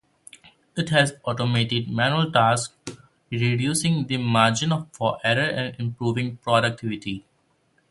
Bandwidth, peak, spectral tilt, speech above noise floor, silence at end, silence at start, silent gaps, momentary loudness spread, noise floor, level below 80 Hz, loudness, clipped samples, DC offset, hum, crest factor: 12 kHz; -2 dBFS; -4.5 dB/octave; 43 dB; 0.7 s; 0.75 s; none; 13 LU; -66 dBFS; -56 dBFS; -23 LUFS; under 0.1%; under 0.1%; none; 22 dB